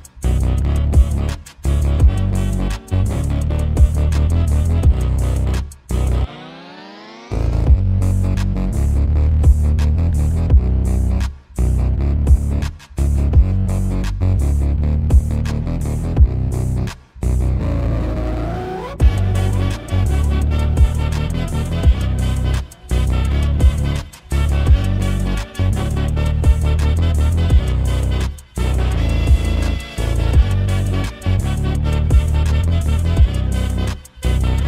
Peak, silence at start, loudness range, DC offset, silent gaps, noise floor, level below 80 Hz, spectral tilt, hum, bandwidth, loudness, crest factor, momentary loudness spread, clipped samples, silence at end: 0 dBFS; 0 s; 3 LU; under 0.1%; none; -37 dBFS; -18 dBFS; -7 dB/octave; none; 13 kHz; -18 LUFS; 16 dB; 7 LU; under 0.1%; 0 s